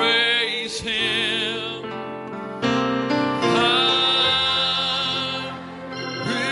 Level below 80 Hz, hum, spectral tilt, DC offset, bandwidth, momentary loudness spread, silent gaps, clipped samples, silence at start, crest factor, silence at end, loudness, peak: -58 dBFS; none; -3.5 dB/octave; under 0.1%; 11.5 kHz; 15 LU; none; under 0.1%; 0 s; 16 dB; 0 s; -20 LUFS; -6 dBFS